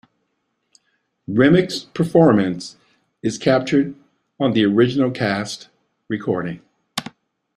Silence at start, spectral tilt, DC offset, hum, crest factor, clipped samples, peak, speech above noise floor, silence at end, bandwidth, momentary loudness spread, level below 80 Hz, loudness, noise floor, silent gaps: 1.3 s; -6.5 dB/octave; under 0.1%; none; 18 dB; under 0.1%; -2 dBFS; 54 dB; 0.55 s; 14 kHz; 16 LU; -56 dBFS; -19 LUFS; -72 dBFS; none